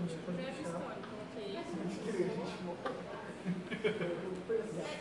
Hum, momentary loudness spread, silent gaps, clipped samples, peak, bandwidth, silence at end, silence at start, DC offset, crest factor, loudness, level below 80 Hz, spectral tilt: none; 7 LU; none; under 0.1%; -22 dBFS; 11.5 kHz; 0 s; 0 s; under 0.1%; 18 dB; -40 LUFS; -70 dBFS; -6 dB/octave